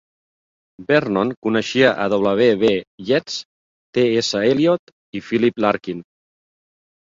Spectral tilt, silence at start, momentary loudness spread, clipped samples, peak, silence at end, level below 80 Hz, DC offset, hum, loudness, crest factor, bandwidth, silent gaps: -5 dB/octave; 0.8 s; 13 LU; under 0.1%; -2 dBFS; 1.15 s; -58 dBFS; under 0.1%; none; -18 LUFS; 18 dB; 7.6 kHz; 1.37-1.42 s, 2.87-2.98 s, 3.45-3.93 s, 4.79-4.87 s, 4.93-5.13 s